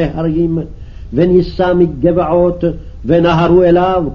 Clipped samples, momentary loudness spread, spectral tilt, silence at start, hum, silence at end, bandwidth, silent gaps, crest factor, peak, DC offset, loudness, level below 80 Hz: under 0.1%; 10 LU; -9 dB/octave; 0 s; none; 0 s; 6.2 kHz; none; 12 dB; 0 dBFS; 1%; -12 LUFS; -30 dBFS